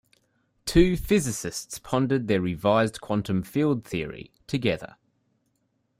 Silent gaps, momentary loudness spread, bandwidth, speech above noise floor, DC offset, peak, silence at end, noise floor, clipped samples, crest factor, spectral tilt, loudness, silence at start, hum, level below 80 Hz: none; 13 LU; 16 kHz; 48 dB; under 0.1%; -6 dBFS; 1.15 s; -73 dBFS; under 0.1%; 20 dB; -5.5 dB/octave; -25 LUFS; 0.65 s; none; -42 dBFS